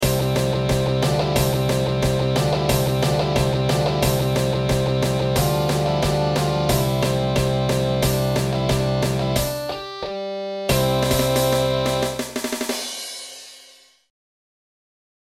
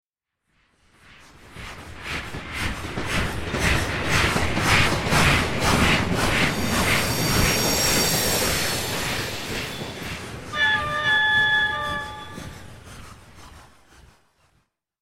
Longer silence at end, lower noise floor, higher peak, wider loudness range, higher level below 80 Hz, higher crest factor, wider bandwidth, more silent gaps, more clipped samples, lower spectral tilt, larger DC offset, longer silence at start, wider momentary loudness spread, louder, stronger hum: first, 1.75 s vs 1.35 s; second, -50 dBFS vs -76 dBFS; about the same, -6 dBFS vs -4 dBFS; second, 3 LU vs 9 LU; about the same, -36 dBFS vs -36 dBFS; about the same, 16 dB vs 20 dB; about the same, 16.5 kHz vs 16.5 kHz; neither; neither; first, -5 dB/octave vs -3 dB/octave; neither; second, 0 s vs 1.1 s; second, 8 LU vs 18 LU; about the same, -21 LUFS vs -21 LUFS; neither